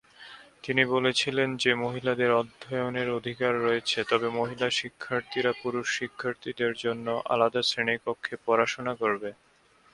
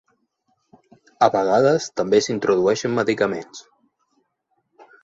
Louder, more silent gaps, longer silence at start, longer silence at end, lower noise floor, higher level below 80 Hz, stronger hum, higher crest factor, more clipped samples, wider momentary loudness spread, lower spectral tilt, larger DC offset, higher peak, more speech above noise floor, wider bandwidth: second, -28 LUFS vs -19 LUFS; neither; second, 0.2 s vs 1.2 s; second, 0.6 s vs 1.45 s; second, -50 dBFS vs -72 dBFS; second, -68 dBFS vs -62 dBFS; neither; about the same, 22 dB vs 20 dB; neither; about the same, 9 LU vs 10 LU; about the same, -4 dB/octave vs -5 dB/octave; neither; second, -6 dBFS vs -2 dBFS; second, 22 dB vs 53 dB; first, 11.5 kHz vs 7.8 kHz